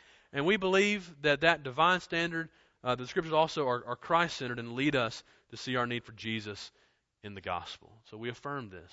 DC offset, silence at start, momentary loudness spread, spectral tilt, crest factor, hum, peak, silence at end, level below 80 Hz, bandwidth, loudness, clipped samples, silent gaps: under 0.1%; 0.35 s; 18 LU; -4.5 dB/octave; 24 dB; none; -8 dBFS; 0.05 s; -66 dBFS; 8 kHz; -31 LUFS; under 0.1%; none